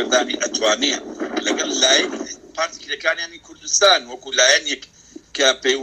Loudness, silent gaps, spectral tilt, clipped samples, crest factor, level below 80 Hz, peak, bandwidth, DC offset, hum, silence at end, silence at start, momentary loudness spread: -18 LUFS; none; 0.5 dB/octave; under 0.1%; 18 dB; -60 dBFS; -2 dBFS; 15 kHz; under 0.1%; none; 0 s; 0 s; 14 LU